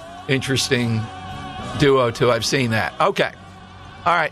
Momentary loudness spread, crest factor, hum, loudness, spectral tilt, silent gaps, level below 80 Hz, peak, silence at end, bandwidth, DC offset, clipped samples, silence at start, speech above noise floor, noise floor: 15 LU; 16 dB; none; -19 LUFS; -4.5 dB/octave; none; -46 dBFS; -4 dBFS; 0 s; 14.5 kHz; under 0.1%; under 0.1%; 0 s; 21 dB; -40 dBFS